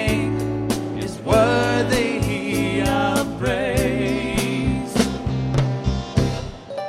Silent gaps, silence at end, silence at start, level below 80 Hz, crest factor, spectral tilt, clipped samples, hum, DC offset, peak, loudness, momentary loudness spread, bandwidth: none; 0 s; 0 s; -34 dBFS; 18 dB; -5.5 dB/octave; under 0.1%; none; under 0.1%; -4 dBFS; -21 LUFS; 6 LU; 16 kHz